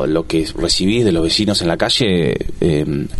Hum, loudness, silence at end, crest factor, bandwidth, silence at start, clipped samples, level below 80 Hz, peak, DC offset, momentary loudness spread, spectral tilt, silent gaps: none; -16 LUFS; 0 s; 14 dB; 12 kHz; 0 s; under 0.1%; -32 dBFS; -2 dBFS; under 0.1%; 5 LU; -5 dB/octave; none